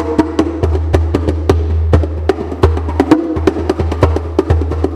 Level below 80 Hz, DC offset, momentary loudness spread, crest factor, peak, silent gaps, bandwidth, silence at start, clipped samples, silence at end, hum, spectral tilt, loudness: -20 dBFS; under 0.1%; 4 LU; 12 dB; 0 dBFS; none; 9 kHz; 0 s; 0.5%; 0 s; none; -8 dB/octave; -14 LUFS